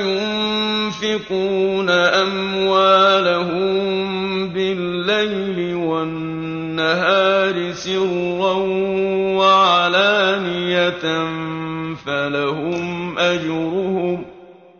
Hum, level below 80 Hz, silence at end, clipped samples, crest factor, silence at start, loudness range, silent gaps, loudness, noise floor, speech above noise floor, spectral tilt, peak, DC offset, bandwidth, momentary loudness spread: none; -56 dBFS; 0.25 s; under 0.1%; 16 dB; 0 s; 5 LU; none; -18 LUFS; -42 dBFS; 24 dB; -5 dB/octave; -4 dBFS; under 0.1%; 7 kHz; 10 LU